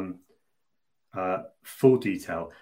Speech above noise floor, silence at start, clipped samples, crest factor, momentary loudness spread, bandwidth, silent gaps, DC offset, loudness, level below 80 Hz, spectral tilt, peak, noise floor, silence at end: 59 dB; 0 s; under 0.1%; 22 dB; 20 LU; 16 kHz; none; under 0.1%; -26 LUFS; -64 dBFS; -7 dB/octave; -8 dBFS; -84 dBFS; 0.1 s